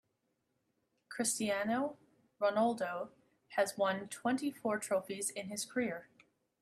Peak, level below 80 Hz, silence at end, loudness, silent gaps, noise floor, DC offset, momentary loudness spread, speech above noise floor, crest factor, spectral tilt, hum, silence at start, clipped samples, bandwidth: -18 dBFS; -80 dBFS; 0.55 s; -36 LUFS; none; -82 dBFS; under 0.1%; 8 LU; 46 dB; 20 dB; -3.5 dB/octave; none; 1.1 s; under 0.1%; 15 kHz